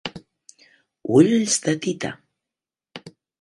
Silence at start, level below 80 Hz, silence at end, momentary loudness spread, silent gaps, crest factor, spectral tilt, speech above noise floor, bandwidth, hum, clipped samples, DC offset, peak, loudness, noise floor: 0.05 s; -64 dBFS; 0.3 s; 25 LU; none; 22 dB; -4.5 dB/octave; 70 dB; 11.5 kHz; none; under 0.1%; under 0.1%; -2 dBFS; -20 LUFS; -88 dBFS